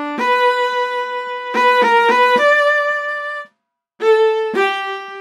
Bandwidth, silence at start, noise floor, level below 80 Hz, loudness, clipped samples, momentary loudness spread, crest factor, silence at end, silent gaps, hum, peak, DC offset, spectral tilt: 13.5 kHz; 0 s; -69 dBFS; -78 dBFS; -15 LUFS; under 0.1%; 11 LU; 12 dB; 0 s; none; none; -4 dBFS; under 0.1%; -2.5 dB/octave